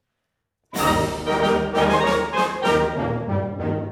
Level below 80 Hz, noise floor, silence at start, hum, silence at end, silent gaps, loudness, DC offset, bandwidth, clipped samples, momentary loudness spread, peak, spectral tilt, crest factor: -42 dBFS; -78 dBFS; 0.7 s; none; 0 s; none; -21 LUFS; under 0.1%; 17 kHz; under 0.1%; 7 LU; -6 dBFS; -5.5 dB/octave; 16 dB